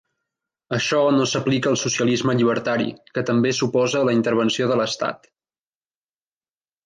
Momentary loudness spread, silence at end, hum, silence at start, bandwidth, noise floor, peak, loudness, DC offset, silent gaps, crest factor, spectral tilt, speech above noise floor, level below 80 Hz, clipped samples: 7 LU; 1.7 s; none; 0.7 s; 9.8 kHz; under -90 dBFS; -8 dBFS; -20 LUFS; under 0.1%; none; 14 dB; -4.5 dB/octave; over 70 dB; -64 dBFS; under 0.1%